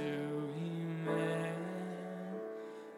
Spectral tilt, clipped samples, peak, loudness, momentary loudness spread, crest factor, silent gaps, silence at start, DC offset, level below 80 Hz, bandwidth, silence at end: -7 dB/octave; under 0.1%; -24 dBFS; -40 LUFS; 8 LU; 16 dB; none; 0 s; under 0.1%; -86 dBFS; 13.5 kHz; 0 s